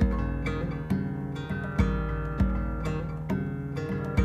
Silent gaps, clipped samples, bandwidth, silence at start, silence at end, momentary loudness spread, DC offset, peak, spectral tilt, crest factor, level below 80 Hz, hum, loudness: none; under 0.1%; 9.2 kHz; 0 s; 0 s; 5 LU; under 0.1%; -10 dBFS; -8.5 dB/octave; 18 dB; -34 dBFS; none; -30 LUFS